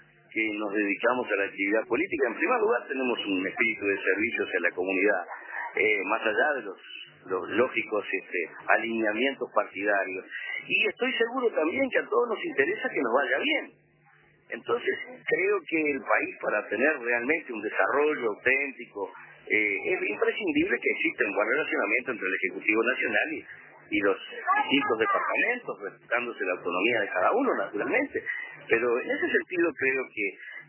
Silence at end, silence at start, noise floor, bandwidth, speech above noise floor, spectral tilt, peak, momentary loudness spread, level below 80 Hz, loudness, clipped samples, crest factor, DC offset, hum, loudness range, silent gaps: 0.05 s; 0.3 s; -61 dBFS; 3.2 kHz; 33 dB; -7 dB/octave; -8 dBFS; 8 LU; -72 dBFS; -27 LUFS; under 0.1%; 20 dB; under 0.1%; none; 2 LU; none